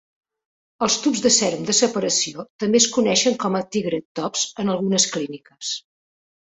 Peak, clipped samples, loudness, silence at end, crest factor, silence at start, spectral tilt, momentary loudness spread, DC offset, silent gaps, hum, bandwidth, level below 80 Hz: -2 dBFS; under 0.1%; -20 LUFS; 0.8 s; 20 dB; 0.8 s; -2.5 dB/octave; 12 LU; under 0.1%; 2.50-2.59 s, 4.05-4.15 s; none; 8.4 kHz; -62 dBFS